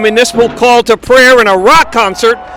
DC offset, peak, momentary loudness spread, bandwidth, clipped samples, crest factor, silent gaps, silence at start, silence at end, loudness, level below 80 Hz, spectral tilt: under 0.1%; 0 dBFS; 6 LU; 19 kHz; under 0.1%; 6 dB; none; 0 s; 0 s; -6 LUFS; -34 dBFS; -2.5 dB/octave